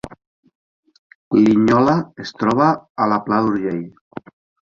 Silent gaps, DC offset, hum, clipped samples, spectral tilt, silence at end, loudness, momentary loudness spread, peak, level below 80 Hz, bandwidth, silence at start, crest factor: 0.27-0.43 s, 0.55-0.83 s, 0.98-1.31 s, 2.90-2.95 s, 4.01-4.11 s; under 0.1%; none; under 0.1%; -7.5 dB/octave; 0.5 s; -17 LUFS; 23 LU; -2 dBFS; -54 dBFS; 7.4 kHz; 0.05 s; 16 dB